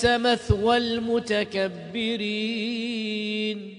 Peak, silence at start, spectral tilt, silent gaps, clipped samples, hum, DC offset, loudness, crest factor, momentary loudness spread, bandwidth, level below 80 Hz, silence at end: -8 dBFS; 0 s; -5 dB/octave; none; under 0.1%; none; under 0.1%; -25 LUFS; 18 dB; 7 LU; 10.5 kHz; -44 dBFS; 0 s